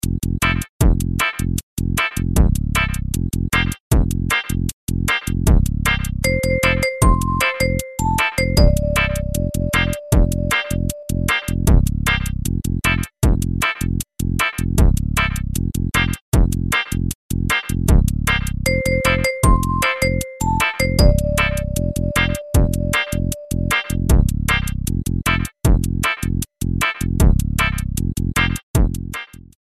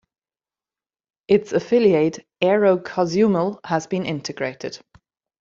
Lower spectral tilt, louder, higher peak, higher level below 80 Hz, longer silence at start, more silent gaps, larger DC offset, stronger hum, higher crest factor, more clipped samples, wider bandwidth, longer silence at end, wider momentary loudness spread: about the same, -5 dB/octave vs -6 dB/octave; about the same, -19 LUFS vs -20 LUFS; first, 0 dBFS vs -4 dBFS; first, -22 dBFS vs -62 dBFS; second, 0.05 s vs 1.3 s; first, 0.69-0.79 s, 1.63-1.77 s, 3.80-3.91 s, 4.73-4.87 s, 16.21-16.32 s, 17.15-17.29 s, 28.63-28.74 s vs none; first, 0.5% vs under 0.1%; neither; about the same, 18 dB vs 18 dB; neither; first, 15.5 kHz vs 7.6 kHz; second, 0.3 s vs 0.65 s; second, 6 LU vs 11 LU